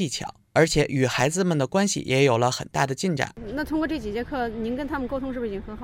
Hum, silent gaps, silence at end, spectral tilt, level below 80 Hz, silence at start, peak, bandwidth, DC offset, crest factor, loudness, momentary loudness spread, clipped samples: none; none; 0 s; -5 dB/octave; -44 dBFS; 0 s; -6 dBFS; 16.5 kHz; under 0.1%; 18 dB; -24 LUFS; 9 LU; under 0.1%